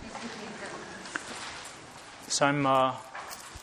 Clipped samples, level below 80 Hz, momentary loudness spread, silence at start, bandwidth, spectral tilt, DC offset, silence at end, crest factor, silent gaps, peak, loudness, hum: under 0.1%; -62 dBFS; 18 LU; 0 s; 14.5 kHz; -3.5 dB/octave; under 0.1%; 0 s; 24 dB; none; -8 dBFS; -31 LUFS; none